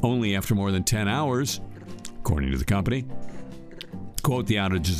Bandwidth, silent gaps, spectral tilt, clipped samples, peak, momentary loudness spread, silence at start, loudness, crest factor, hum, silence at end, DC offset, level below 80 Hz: 15.5 kHz; none; -5 dB/octave; under 0.1%; -4 dBFS; 17 LU; 0 s; -26 LUFS; 20 dB; none; 0 s; under 0.1%; -38 dBFS